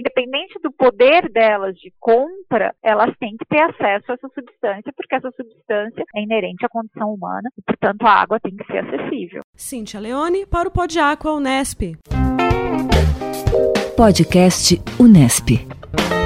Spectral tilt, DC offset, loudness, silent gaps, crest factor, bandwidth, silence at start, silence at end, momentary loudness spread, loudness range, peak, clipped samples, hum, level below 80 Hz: -5 dB/octave; under 0.1%; -17 LUFS; 9.44-9.53 s; 16 dB; 16 kHz; 0 s; 0 s; 15 LU; 9 LU; 0 dBFS; under 0.1%; none; -32 dBFS